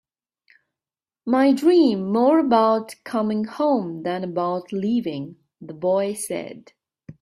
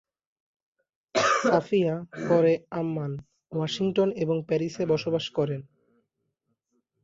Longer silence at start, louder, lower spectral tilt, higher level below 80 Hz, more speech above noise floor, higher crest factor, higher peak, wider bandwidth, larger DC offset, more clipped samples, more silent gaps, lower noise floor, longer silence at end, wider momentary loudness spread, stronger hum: about the same, 1.25 s vs 1.15 s; first, -21 LUFS vs -26 LUFS; about the same, -6 dB/octave vs -5.5 dB/octave; about the same, -68 dBFS vs -66 dBFS; first, over 69 dB vs 52 dB; about the same, 18 dB vs 20 dB; first, -4 dBFS vs -8 dBFS; first, 14 kHz vs 7.8 kHz; neither; neither; neither; first, under -90 dBFS vs -78 dBFS; second, 0.1 s vs 1.4 s; first, 14 LU vs 11 LU; neither